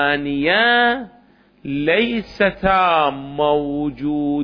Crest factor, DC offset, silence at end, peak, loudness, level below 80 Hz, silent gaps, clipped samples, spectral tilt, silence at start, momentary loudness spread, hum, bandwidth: 14 dB; under 0.1%; 0 s; -4 dBFS; -18 LUFS; -44 dBFS; none; under 0.1%; -7 dB/octave; 0 s; 10 LU; none; 5.4 kHz